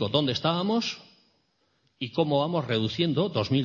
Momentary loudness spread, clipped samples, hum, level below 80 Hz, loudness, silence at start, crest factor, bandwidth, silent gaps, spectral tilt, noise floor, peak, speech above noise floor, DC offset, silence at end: 8 LU; under 0.1%; none; -62 dBFS; -27 LUFS; 0 s; 20 dB; 7.2 kHz; none; -6.5 dB/octave; -70 dBFS; -8 dBFS; 44 dB; under 0.1%; 0 s